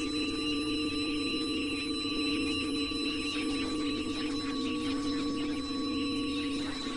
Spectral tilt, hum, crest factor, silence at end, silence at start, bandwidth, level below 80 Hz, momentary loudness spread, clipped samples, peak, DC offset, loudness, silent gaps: -4 dB/octave; none; 12 dB; 0 s; 0 s; 11.5 kHz; -52 dBFS; 3 LU; under 0.1%; -20 dBFS; under 0.1%; -32 LUFS; none